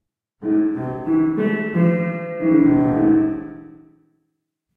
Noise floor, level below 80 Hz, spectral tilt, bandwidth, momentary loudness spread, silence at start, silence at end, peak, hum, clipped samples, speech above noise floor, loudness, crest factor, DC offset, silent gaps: -75 dBFS; -50 dBFS; -11 dB/octave; 3.3 kHz; 10 LU; 0.4 s; 1.1 s; -6 dBFS; none; under 0.1%; 58 dB; -19 LUFS; 14 dB; under 0.1%; none